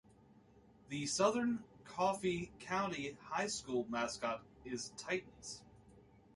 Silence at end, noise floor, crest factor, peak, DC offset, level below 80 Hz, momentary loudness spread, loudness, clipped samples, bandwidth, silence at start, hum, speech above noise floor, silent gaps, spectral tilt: 0.35 s; -65 dBFS; 22 dB; -18 dBFS; under 0.1%; -70 dBFS; 13 LU; -39 LUFS; under 0.1%; 11.5 kHz; 0.3 s; none; 26 dB; none; -3.5 dB/octave